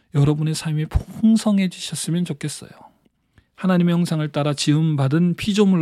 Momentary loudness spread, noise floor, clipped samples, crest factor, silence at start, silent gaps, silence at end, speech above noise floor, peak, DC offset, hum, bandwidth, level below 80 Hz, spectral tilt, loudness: 8 LU; -61 dBFS; under 0.1%; 14 dB; 0.15 s; none; 0 s; 42 dB; -4 dBFS; under 0.1%; none; 14 kHz; -40 dBFS; -6 dB/octave; -20 LUFS